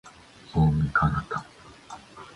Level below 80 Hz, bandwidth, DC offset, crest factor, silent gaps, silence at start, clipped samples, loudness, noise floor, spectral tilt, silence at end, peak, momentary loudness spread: -40 dBFS; 10.5 kHz; under 0.1%; 18 dB; none; 0.05 s; under 0.1%; -25 LUFS; -49 dBFS; -7.5 dB/octave; 0.1 s; -10 dBFS; 22 LU